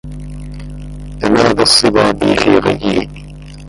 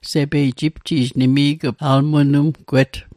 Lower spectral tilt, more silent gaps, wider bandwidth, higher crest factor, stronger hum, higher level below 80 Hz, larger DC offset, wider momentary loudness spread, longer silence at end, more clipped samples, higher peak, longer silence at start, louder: second, -4 dB/octave vs -7 dB/octave; neither; second, 11.5 kHz vs 13.5 kHz; about the same, 14 dB vs 14 dB; first, 50 Hz at -30 dBFS vs none; first, -32 dBFS vs -46 dBFS; neither; first, 21 LU vs 5 LU; second, 0 s vs 0.15 s; neither; about the same, 0 dBFS vs -2 dBFS; about the same, 0.05 s vs 0.05 s; first, -11 LUFS vs -17 LUFS